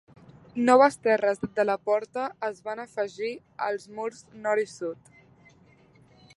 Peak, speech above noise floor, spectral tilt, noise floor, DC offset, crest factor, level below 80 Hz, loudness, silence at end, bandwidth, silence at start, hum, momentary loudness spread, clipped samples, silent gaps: -4 dBFS; 31 dB; -5 dB/octave; -58 dBFS; under 0.1%; 22 dB; -70 dBFS; -27 LUFS; 1.4 s; 11.5 kHz; 0.55 s; none; 16 LU; under 0.1%; none